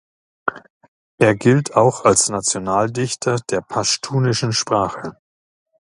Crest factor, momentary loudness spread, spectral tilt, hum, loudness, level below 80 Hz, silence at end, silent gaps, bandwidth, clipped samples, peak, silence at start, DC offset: 20 dB; 12 LU; -4 dB/octave; none; -18 LUFS; -52 dBFS; 0.8 s; 0.70-0.81 s, 0.88-1.18 s; 11.5 kHz; under 0.1%; 0 dBFS; 0.45 s; under 0.1%